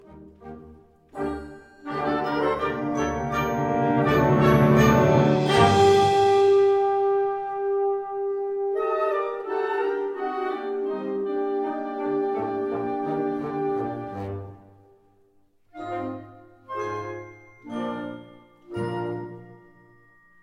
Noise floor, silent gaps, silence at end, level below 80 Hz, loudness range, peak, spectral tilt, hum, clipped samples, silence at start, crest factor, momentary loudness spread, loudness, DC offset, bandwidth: -61 dBFS; none; 0.9 s; -48 dBFS; 16 LU; -4 dBFS; -6.5 dB/octave; none; under 0.1%; 0.1 s; 20 dB; 19 LU; -24 LUFS; under 0.1%; 13 kHz